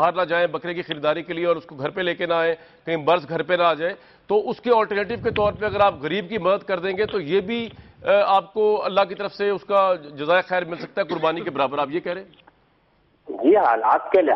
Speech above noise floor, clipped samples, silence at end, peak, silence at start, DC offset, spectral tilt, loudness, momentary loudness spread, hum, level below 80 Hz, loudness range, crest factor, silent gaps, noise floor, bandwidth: 40 dB; under 0.1%; 0 s; -6 dBFS; 0 s; under 0.1%; -7.5 dB/octave; -22 LUFS; 10 LU; none; -56 dBFS; 2 LU; 16 dB; none; -61 dBFS; 6 kHz